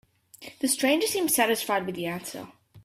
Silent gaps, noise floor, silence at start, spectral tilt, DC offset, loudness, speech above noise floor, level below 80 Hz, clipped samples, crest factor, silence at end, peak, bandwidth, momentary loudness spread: none; -48 dBFS; 0.4 s; -2.5 dB/octave; under 0.1%; -25 LUFS; 22 dB; -68 dBFS; under 0.1%; 18 dB; 0.05 s; -10 dBFS; 16 kHz; 18 LU